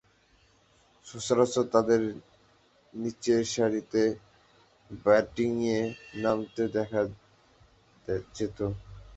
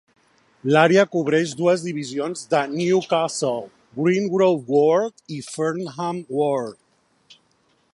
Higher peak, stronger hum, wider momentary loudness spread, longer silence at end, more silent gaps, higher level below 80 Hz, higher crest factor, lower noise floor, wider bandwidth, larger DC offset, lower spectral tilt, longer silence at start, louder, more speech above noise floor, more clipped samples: second, -8 dBFS vs 0 dBFS; neither; first, 16 LU vs 11 LU; second, 0 s vs 1.2 s; neither; first, -58 dBFS vs -70 dBFS; about the same, 22 dB vs 20 dB; about the same, -64 dBFS vs -64 dBFS; second, 8.2 kHz vs 11.5 kHz; neither; about the same, -5.5 dB/octave vs -5.5 dB/octave; first, 1.05 s vs 0.65 s; second, -29 LUFS vs -21 LUFS; second, 36 dB vs 43 dB; neither